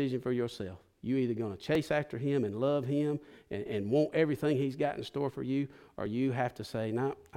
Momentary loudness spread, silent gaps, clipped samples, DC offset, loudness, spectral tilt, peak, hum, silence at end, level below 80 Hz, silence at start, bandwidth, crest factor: 11 LU; none; under 0.1%; under 0.1%; -33 LUFS; -7.5 dB/octave; -16 dBFS; none; 0 s; -66 dBFS; 0 s; 16 kHz; 18 dB